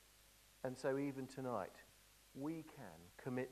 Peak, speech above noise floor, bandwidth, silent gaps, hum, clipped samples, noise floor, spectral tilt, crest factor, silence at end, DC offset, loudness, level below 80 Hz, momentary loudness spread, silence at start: -28 dBFS; 23 dB; 14 kHz; none; none; under 0.1%; -68 dBFS; -6.5 dB/octave; 18 dB; 0 s; under 0.1%; -47 LUFS; -76 dBFS; 24 LU; 0 s